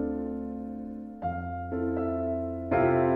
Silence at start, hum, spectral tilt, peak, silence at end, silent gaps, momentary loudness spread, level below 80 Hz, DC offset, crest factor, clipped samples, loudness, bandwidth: 0 s; none; -11 dB/octave; -14 dBFS; 0 s; none; 12 LU; -50 dBFS; under 0.1%; 16 dB; under 0.1%; -31 LUFS; 4 kHz